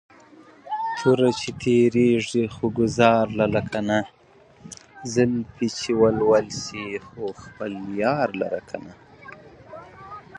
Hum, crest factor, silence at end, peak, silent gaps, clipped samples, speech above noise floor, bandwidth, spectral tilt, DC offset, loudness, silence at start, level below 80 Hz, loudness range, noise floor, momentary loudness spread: none; 22 dB; 0 s; -2 dBFS; none; under 0.1%; 28 dB; 10 kHz; -5.5 dB/octave; under 0.1%; -23 LUFS; 0.65 s; -54 dBFS; 8 LU; -50 dBFS; 23 LU